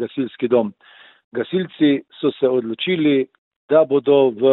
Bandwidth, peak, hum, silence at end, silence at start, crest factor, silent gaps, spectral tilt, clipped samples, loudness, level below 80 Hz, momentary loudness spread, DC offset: 4.1 kHz; -2 dBFS; none; 0 s; 0 s; 16 dB; 1.24-1.32 s, 3.38-3.68 s; -10.5 dB/octave; under 0.1%; -19 LUFS; -68 dBFS; 10 LU; under 0.1%